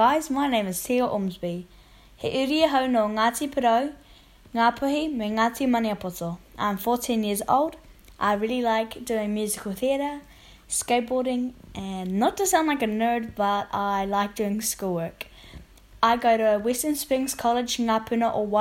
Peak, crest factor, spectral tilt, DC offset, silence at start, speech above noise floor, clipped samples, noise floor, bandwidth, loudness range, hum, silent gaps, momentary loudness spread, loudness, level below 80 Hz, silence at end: -6 dBFS; 20 dB; -4 dB/octave; under 0.1%; 0 s; 27 dB; under 0.1%; -52 dBFS; 16.5 kHz; 3 LU; none; none; 11 LU; -25 LUFS; -54 dBFS; 0 s